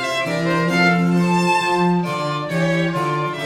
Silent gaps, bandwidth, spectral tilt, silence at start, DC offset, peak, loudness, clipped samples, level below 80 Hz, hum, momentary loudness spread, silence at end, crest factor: none; 13 kHz; -6 dB/octave; 0 s; under 0.1%; -4 dBFS; -18 LUFS; under 0.1%; -60 dBFS; none; 6 LU; 0 s; 14 dB